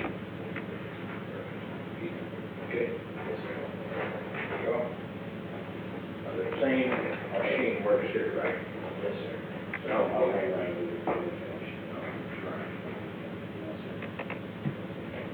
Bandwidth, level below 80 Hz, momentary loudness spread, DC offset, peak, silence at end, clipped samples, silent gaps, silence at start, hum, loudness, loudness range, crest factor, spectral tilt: over 20 kHz; -64 dBFS; 11 LU; under 0.1%; -14 dBFS; 0 s; under 0.1%; none; 0 s; none; -34 LUFS; 7 LU; 18 dB; -8 dB/octave